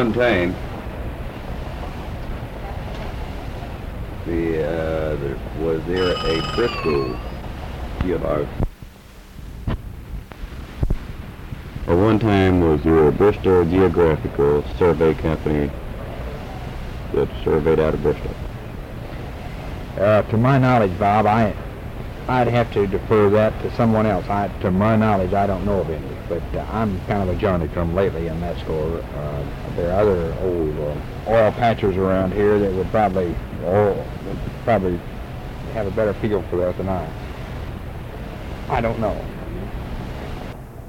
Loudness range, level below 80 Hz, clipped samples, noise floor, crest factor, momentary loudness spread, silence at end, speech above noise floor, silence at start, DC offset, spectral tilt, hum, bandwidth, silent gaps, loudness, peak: 10 LU; -32 dBFS; under 0.1%; -41 dBFS; 14 dB; 16 LU; 0 s; 22 dB; 0 s; under 0.1%; -8 dB/octave; none; 16.5 kHz; none; -21 LUFS; -6 dBFS